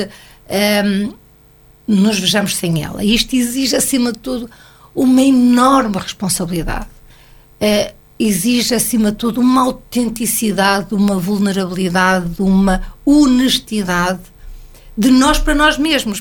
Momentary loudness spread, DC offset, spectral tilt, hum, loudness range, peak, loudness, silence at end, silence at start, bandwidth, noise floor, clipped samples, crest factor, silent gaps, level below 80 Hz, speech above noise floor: 11 LU; under 0.1%; -4 dB/octave; none; 2 LU; 0 dBFS; -14 LUFS; 0 s; 0 s; 19 kHz; -46 dBFS; under 0.1%; 14 dB; none; -32 dBFS; 32 dB